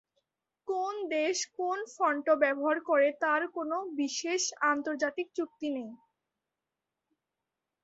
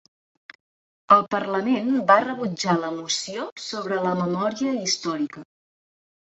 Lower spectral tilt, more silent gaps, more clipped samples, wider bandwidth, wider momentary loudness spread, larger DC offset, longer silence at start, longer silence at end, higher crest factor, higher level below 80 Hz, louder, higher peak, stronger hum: second, -1 dB/octave vs -4 dB/octave; second, none vs 3.52-3.56 s; neither; about the same, 8 kHz vs 8.2 kHz; second, 10 LU vs 13 LU; neither; second, 0.65 s vs 1.1 s; first, 1.9 s vs 0.9 s; about the same, 20 dB vs 24 dB; second, -82 dBFS vs -70 dBFS; second, -31 LUFS vs -23 LUFS; second, -12 dBFS vs -2 dBFS; neither